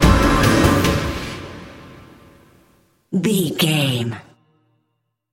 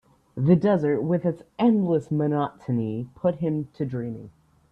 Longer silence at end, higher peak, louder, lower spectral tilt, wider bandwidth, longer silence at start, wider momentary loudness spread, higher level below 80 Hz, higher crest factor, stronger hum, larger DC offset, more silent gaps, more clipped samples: first, 1.1 s vs 0.4 s; first, -2 dBFS vs -6 dBFS; first, -18 LUFS vs -24 LUFS; second, -5 dB/octave vs -10 dB/octave; first, 16.5 kHz vs 5.8 kHz; second, 0 s vs 0.35 s; first, 21 LU vs 11 LU; first, -28 dBFS vs -60 dBFS; about the same, 18 dB vs 18 dB; neither; neither; neither; neither